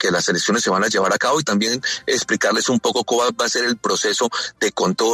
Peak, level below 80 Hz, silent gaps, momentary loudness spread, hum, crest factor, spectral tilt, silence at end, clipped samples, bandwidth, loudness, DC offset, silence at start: -6 dBFS; -62 dBFS; none; 3 LU; none; 12 dB; -2.5 dB/octave; 0 s; under 0.1%; 13.5 kHz; -18 LUFS; under 0.1%; 0 s